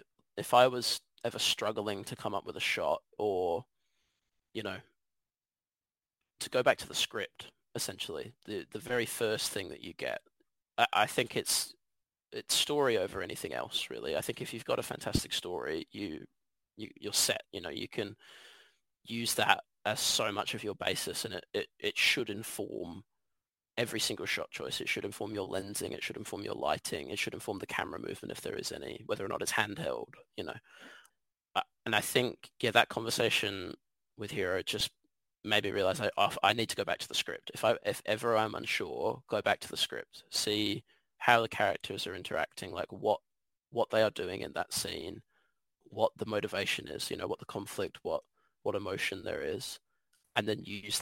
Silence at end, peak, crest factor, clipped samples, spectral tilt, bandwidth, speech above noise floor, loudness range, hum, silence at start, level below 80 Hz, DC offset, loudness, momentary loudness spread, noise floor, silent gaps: 0 s; -8 dBFS; 28 dB; under 0.1%; -2.5 dB/octave; 16.5 kHz; over 56 dB; 5 LU; none; 0.35 s; -66 dBFS; under 0.1%; -33 LUFS; 13 LU; under -90 dBFS; none